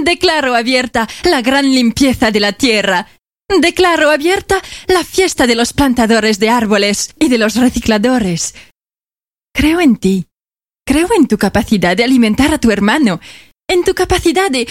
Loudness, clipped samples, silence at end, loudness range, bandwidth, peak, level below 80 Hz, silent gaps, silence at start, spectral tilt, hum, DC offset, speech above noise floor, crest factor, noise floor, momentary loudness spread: -12 LUFS; under 0.1%; 0 s; 3 LU; 16.5 kHz; 0 dBFS; -34 dBFS; none; 0 s; -4 dB/octave; none; 0.3%; over 78 dB; 12 dB; under -90 dBFS; 6 LU